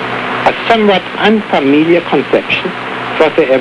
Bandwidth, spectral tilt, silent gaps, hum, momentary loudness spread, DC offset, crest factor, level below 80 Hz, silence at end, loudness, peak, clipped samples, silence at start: 11 kHz; -6 dB/octave; none; none; 7 LU; under 0.1%; 12 dB; -48 dBFS; 0 s; -11 LUFS; 0 dBFS; 0.2%; 0 s